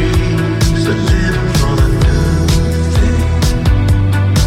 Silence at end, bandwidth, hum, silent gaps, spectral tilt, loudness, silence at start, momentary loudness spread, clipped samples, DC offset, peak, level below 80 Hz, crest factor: 0 s; 16 kHz; none; none; -6 dB/octave; -13 LUFS; 0 s; 2 LU; under 0.1%; under 0.1%; 0 dBFS; -16 dBFS; 10 dB